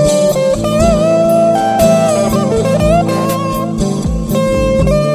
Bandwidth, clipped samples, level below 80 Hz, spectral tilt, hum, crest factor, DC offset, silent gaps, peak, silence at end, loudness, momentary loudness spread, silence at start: 16 kHz; under 0.1%; -24 dBFS; -6 dB/octave; none; 12 dB; under 0.1%; none; 0 dBFS; 0 s; -12 LUFS; 6 LU; 0 s